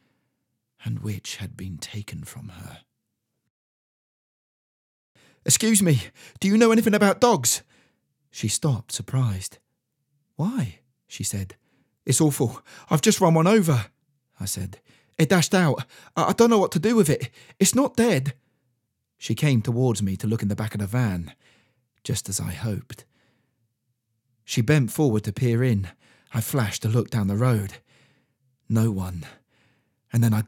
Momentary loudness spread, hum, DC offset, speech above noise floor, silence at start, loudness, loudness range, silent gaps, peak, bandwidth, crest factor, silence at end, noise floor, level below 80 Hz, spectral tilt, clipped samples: 19 LU; none; under 0.1%; 57 dB; 0.85 s; -23 LUFS; 11 LU; 3.50-5.15 s; -2 dBFS; 17.5 kHz; 22 dB; 0 s; -79 dBFS; -62 dBFS; -5 dB/octave; under 0.1%